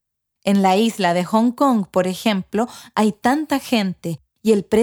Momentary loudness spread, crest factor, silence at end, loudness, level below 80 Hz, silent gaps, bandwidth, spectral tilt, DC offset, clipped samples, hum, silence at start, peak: 7 LU; 16 dB; 0 s; -19 LUFS; -58 dBFS; none; 20 kHz; -5.5 dB/octave; under 0.1%; under 0.1%; none; 0.45 s; -2 dBFS